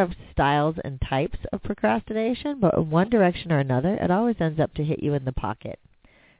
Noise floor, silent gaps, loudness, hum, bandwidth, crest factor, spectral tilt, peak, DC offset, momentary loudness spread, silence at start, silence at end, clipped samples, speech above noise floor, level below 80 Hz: -57 dBFS; none; -24 LUFS; none; 4 kHz; 16 dB; -11.5 dB/octave; -6 dBFS; under 0.1%; 10 LU; 0 s; 0.65 s; under 0.1%; 33 dB; -42 dBFS